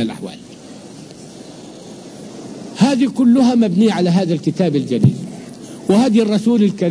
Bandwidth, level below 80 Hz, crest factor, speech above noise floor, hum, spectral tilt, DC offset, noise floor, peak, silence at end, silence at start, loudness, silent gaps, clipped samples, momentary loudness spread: 10.5 kHz; -56 dBFS; 16 dB; 22 dB; none; -7 dB/octave; under 0.1%; -36 dBFS; 0 dBFS; 0 s; 0 s; -15 LUFS; none; under 0.1%; 23 LU